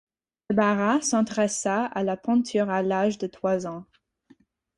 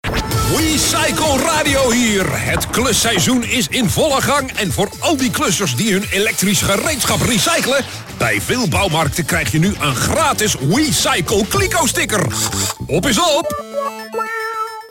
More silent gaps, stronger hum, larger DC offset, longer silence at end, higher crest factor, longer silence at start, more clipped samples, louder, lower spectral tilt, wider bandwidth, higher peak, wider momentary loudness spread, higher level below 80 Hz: neither; neither; neither; first, 0.95 s vs 0 s; first, 18 dB vs 12 dB; first, 0.5 s vs 0.05 s; neither; second, -25 LUFS vs -15 LUFS; about the same, -4.5 dB/octave vs -3.5 dB/octave; second, 11.5 kHz vs 17 kHz; second, -8 dBFS vs -4 dBFS; about the same, 6 LU vs 6 LU; second, -66 dBFS vs -34 dBFS